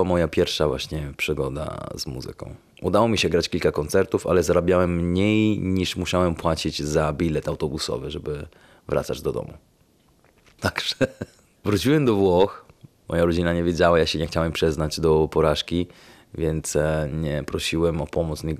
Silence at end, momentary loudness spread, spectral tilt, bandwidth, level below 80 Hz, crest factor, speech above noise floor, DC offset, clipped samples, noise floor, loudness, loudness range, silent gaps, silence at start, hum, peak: 0 s; 12 LU; -5.5 dB/octave; 14.5 kHz; -44 dBFS; 20 dB; 37 dB; under 0.1%; under 0.1%; -60 dBFS; -23 LUFS; 7 LU; none; 0 s; none; -4 dBFS